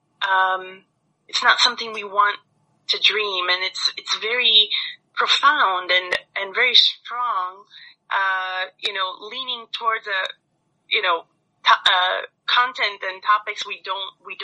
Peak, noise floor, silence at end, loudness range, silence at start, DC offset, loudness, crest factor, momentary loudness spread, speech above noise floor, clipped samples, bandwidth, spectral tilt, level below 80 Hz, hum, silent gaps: 0 dBFS; -62 dBFS; 0 s; 7 LU; 0.2 s; under 0.1%; -19 LUFS; 22 dB; 13 LU; 40 dB; under 0.1%; 11 kHz; 1 dB/octave; -76 dBFS; none; none